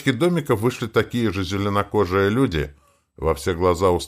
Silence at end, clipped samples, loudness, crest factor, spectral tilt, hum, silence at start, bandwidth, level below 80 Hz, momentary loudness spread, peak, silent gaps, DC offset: 0 s; under 0.1%; -21 LUFS; 16 dB; -6 dB/octave; none; 0 s; 16 kHz; -40 dBFS; 6 LU; -4 dBFS; none; under 0.1%